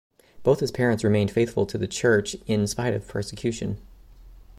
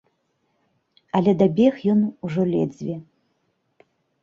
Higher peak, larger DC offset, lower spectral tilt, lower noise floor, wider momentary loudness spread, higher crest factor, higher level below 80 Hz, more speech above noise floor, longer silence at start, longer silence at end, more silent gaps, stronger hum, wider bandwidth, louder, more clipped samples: second, -8 dBFS vs -4 dBFS; neither; second, -5.5 dB/octave vs -9 dB/octave; second, -47 dBFS vs -70 dBFS; second, 9 LU vs 14 LU; about the same, 18 dB vs 18 dB; first, -50 dBFS vs -62 dBFS; second, 23 dB vs 51 dB; second, 0.35 s vs 1.15 s; second, 0.15 s vs 1.2 s; neither; neither; first, 15.5 kHz vs 7 kHz; second, -25 LUFS vs -21 LUFS; neither